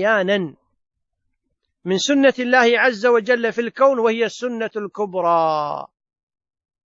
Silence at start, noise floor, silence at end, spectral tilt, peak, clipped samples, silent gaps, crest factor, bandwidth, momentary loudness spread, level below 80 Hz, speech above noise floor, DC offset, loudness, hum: 0 s; -74 dBFS; 1 s; -4 dB/octave; -2 dBFS; under 0.1%; none; 18 dB; 8 kHz; 11 LU; -72 dBFS; 56 dB; under 0.1%; -18 LUFS; none